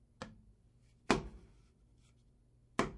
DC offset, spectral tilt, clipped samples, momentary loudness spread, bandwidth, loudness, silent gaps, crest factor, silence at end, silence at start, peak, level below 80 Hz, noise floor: under 0.1%; -4.5 dB/octave; under 0.1%; 24 LU; 11 kHz; -37 LUFS; none; 34 dB; 0 s; 0.2 s; -10 dBFS; -58 dBFS; -68 dBFS